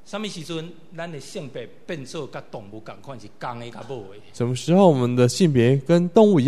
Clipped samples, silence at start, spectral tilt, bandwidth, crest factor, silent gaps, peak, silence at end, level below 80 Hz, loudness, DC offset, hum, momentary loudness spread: under 0.1%; 0.15 s; -6.5 dB/octave; 13.5 kHz; 20 dB; none; -2 dBFS; 0 s; -60 dBFS; -19 LUFS; 0.8%; none; 22 LU